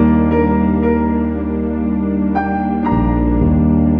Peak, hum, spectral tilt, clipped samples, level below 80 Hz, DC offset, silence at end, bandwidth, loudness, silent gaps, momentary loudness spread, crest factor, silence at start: -2 dBFS; none; -12 dB/octave; under 0.1%; -24 dBFS; 0.3%; 0 s; 4.2 kHz; -16 LUFS; none; 5 LU; 12 dB; 0 s